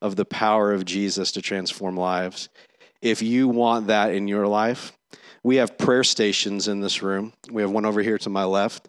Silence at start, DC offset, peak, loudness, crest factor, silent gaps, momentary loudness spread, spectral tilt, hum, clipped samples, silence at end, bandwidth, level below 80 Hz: 0 s; under 0.1%; -6 dBFS; -22 LUFS; 18 dB; none; 8 LU; -4 dB/octave; none; under 0.1%; 0.1 s; 12 kHz; -74 dBFS